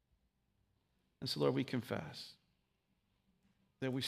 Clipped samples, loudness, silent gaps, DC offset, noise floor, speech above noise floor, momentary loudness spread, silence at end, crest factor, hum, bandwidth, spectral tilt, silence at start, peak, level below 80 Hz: under 0.1%; -40 LUFS; none; under 0.1%; -81 dBFS; 43 dB; 15 LU; 0 s; 24 dB; none; 15.5 kHz; -5.5 dB/octave; 1.2 s; -20 dBFS; -78 dBFS